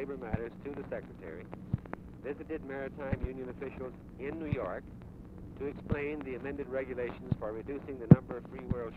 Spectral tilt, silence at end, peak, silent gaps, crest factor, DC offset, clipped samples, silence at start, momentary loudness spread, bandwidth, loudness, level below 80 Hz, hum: -10.5 dB/octave; 0 s; -6 dBFS; none; 28 dB; under 0.1%; under 0.1%; 0 s; 10 LU; 4.5 kHz; -35 LUFS; -50 dBFS; none